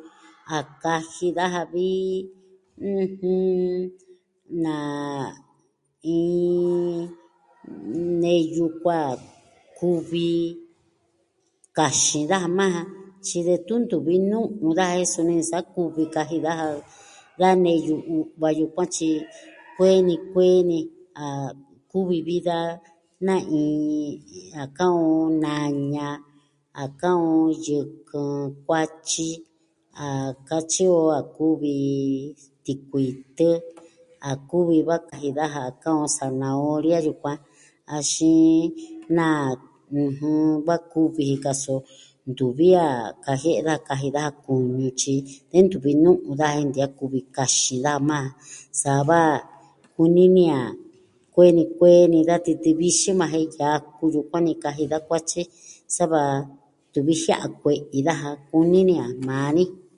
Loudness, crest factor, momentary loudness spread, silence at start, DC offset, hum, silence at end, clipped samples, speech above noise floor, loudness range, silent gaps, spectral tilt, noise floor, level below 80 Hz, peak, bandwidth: -22 LUFS; 20 dB; 14 LU; 0.05 s; under 0.1%; none; 0.2 s; under 0.1%; 47 dB; 7 LU; none; -5 dB/octave; -68 dBFS; -64 dBFS; -2 dBFS; 11.5 kHz